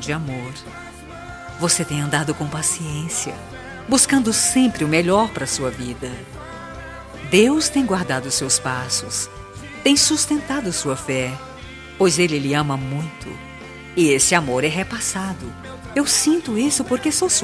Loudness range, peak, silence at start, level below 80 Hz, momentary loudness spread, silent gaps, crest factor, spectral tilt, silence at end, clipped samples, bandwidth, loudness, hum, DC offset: 4 LU; 0 dBFS; 0 s; -46 dBFS; 20 LU; none; 20 dB; -3.5 dB/octave; 0 s; under 0.1%; 11 kHz; -19 LUFS; none; under 0.1%